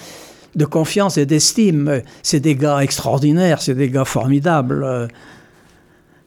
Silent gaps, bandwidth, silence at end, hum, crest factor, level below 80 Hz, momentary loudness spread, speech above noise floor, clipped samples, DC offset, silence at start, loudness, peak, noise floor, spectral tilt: none; 17 kHz; 1.15 s; none; 16 dB; -52 dBFS; 8 LU; 35 dB; under 0.1%; under 0.1%; 0 s; -16 LUFS; -2 dBFS; -51 dBFS; -5 dB/octave